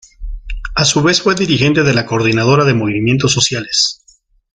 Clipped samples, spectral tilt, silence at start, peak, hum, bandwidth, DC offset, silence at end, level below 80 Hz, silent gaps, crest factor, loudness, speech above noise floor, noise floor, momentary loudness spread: under 0.1%; -4 dB/octave; 0.2 s; 0 dBFS; none; 9.6 kHz; under 0.1%; 0.6 s; -32 dBFS; none; 14 dB; -13 LUFS; 39 dB; -52 dBFS; 11 LU